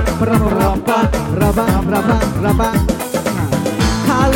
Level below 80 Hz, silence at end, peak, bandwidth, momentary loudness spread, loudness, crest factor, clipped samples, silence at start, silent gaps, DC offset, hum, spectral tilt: -24 dBFS; 0 s; 0 dBFS; 17 kHz; 4 LU; -15 LUFS; 14 dB; under 0.1%; 0 s; none; under 0.1%; none; -6 dB/octave